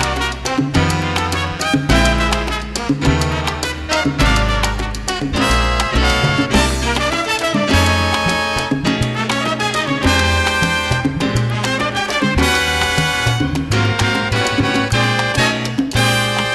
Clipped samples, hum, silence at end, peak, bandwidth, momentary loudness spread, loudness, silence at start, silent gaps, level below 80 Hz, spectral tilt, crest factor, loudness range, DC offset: under 0.1%; none; 0 s; -2 dBFS; 13 kHz; 5 LU; -16 LUFS; 0 s; none; -26 dBFS; -4 dB/octave; 14 dB; 2 LU; under 0.1%